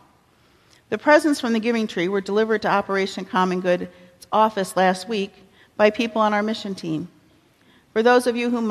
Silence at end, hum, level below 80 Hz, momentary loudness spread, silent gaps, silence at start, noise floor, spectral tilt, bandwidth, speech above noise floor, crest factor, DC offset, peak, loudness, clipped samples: 0 s; none; -64 dBFS; 11 LU; none; 0.9 s; -58 dBFS; -5 dB/octave; 14 kHz; 37 dB; 18 dB; under 0.1%; -4 dBFS; -21 LUFS; under 0.1%